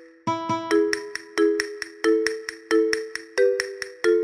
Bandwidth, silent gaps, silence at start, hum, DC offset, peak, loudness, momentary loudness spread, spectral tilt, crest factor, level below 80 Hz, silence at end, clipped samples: 13.5 kHz; none; 0 s; none; under 0.1%; -6 dBFS; -24 LUFS; 8 LU; -3.5 dB/octave; 18 dB; -66 dBFS; 0 s; under 0.1%